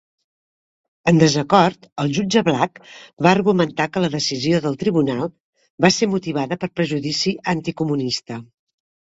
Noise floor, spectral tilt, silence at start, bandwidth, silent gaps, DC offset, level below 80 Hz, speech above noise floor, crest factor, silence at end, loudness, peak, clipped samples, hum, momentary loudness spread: under -90 dBFS; -5 dB/octave; 1.05 s; 8 kHz; 1.92-1.96 s, 3.13-3.17 s, 5.40-5.53 s, 5.70-5.78 s; under 0.1%; -56 dBFS; over 71 dB; 20 dB; 0.75 s; -19 LUFS; 0 dBFS; under 0.1%; none; 9 LU